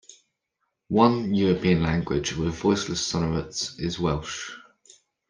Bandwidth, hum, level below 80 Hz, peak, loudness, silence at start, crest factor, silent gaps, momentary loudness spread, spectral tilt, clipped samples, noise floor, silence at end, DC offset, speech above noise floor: 10 kHz; none; -46 dBFS; -4 dBFS; -25 LUFS; 0.1 s; 22 dB; none; 10 LU; -5.5 dB/octave; under 0.1%; -79 dBFS; 0.7 s; under 0.1%; 55 dB